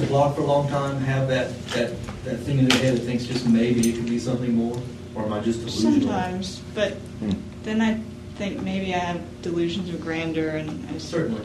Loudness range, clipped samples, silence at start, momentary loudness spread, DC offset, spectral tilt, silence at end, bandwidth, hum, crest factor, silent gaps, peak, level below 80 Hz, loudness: 5 LU; under 0.1%; 0 s; 11 LU; under 0.1%; -6 dB/octave; 0 s; 15 kHz; none; 22 dB; none; -2 dBFS; -48 dBFS; -24 LUFS